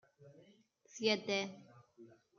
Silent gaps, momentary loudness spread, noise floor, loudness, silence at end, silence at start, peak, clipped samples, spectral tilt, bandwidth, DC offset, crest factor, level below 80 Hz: none; 21 LU; -68 dBFS; -37 LUFS; 0.35 s; 0.2 s; -20 dBFS; under 0.1%; -3.5 dB/octave; 7.2 kHz; under 0.1%; 24 dB; -90 dBFS